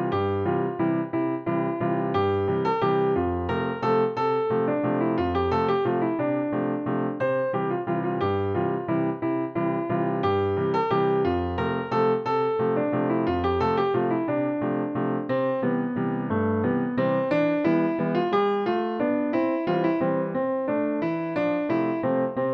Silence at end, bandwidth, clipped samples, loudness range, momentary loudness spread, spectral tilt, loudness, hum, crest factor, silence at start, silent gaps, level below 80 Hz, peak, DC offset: 0 s; 6.4 kHz; under 0.1%; 2 LU; 4 LU; -9 dB/octave; -25 LUFS; none; 14 dB; 0 s; none; -54 dBFS; -10 dBFS; under 0.1%